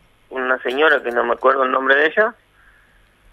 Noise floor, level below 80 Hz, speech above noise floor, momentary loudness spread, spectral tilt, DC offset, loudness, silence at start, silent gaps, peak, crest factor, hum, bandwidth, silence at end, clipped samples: -54 dBFS; -60 dBFS; 37 dB; 7 LU; -4 dB/octave; under 0.1%; -17 LUFS; 0.3 s; none; -2 dBFS; 16 dB; 50 Hz at -65 dBFS; 12.5 kHz; 1 s; under 0.1%